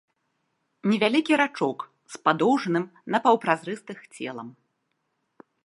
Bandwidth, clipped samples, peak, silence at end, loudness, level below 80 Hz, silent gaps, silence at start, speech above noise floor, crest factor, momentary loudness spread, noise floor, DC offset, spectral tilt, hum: 11.5 kHz; under 0.1%; -4 dBFS; 1.15 s; -24 LUFS; -78 dBFS; none; 0.85 s; 52 dB; 22 dB; 17 LU; -76 dBFS; under 0.1%; -5.5 dB/octave; none